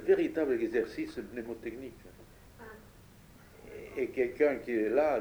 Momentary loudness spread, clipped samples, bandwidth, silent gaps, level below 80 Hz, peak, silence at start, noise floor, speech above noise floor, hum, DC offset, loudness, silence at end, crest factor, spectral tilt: 22 LU; under 0.1%; over 20 kHz; none; -60 dBFS; -14 dBFS; 0 s; -56 dBFS; 25 dB; none; under 0.1%; -32 LUFS; 0 s; 18 dB; -6.5 dB/octave